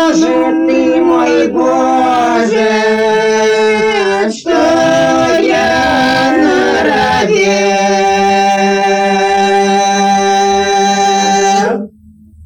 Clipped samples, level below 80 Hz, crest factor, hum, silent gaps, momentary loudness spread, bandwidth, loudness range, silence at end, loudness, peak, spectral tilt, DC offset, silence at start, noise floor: under 0.1%; -44 dBFS; 10 dB; none; none; 1 LU; 18 kHz; 1 LU; 0 s; -10 LUFS; 0 dBFS; -4 dB/octave; under 0.1%; 0 s; -40 dBFS